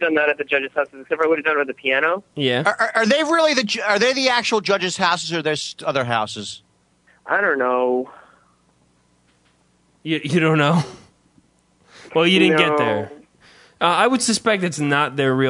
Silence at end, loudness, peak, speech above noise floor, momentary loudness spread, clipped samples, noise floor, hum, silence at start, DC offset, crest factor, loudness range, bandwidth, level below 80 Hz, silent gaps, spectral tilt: 0 s; -19 LUFS; 0 dBFS; 41 dB; 9 LU; under 0.1%; -60 dBFS; none; 0 s; under 0.1%; 20 dB; 6 LU; 11 kHz; -66 dBFS; none; -4 dB/octave